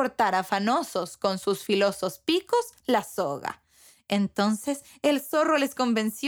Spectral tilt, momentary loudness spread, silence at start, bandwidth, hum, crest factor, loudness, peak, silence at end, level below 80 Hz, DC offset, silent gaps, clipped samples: -4.5 dB/octave; 6 LU; 0 s; over 20 kHz; none; 18 dB; -26 LUFS; -10 dBFS; 0 s; -70 dBFS; under 0.1%; none; under 0.1%